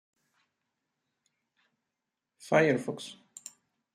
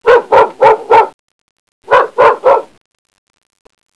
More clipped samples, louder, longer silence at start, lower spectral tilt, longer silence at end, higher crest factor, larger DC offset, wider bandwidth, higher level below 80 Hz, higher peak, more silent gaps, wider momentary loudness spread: second, under 0.1% vs 1%; second, -28 LUFS vs -9 LUFS; first, 2.45 s vs 0.05 s; about the same, -5.5 dB/octave vs -4.5 dB/octave; second, 0.8 s vs 1.35 s; first, 24 dB vs 12 dB; neither; first, 15.5 kHz vs 11 kHz; second, -78 dBFS vs -48 dBFS; second, -10 dBFS vs 0 dBFS; second, none vs 1.14-1.82 s; first, 22 LU vs 4 LU